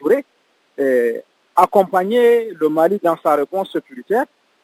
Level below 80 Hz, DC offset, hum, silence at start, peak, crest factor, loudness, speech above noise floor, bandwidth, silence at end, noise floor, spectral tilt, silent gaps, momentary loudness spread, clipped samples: -68 dBFS; under 0.1%; none; 0 s; 0 dBFS; 18 dB; -17 LUFS; 44 dB; 16 kHz; 0.4 s; -61 dBFS; -6 dB/octave; none; 9 LU; under 0.1%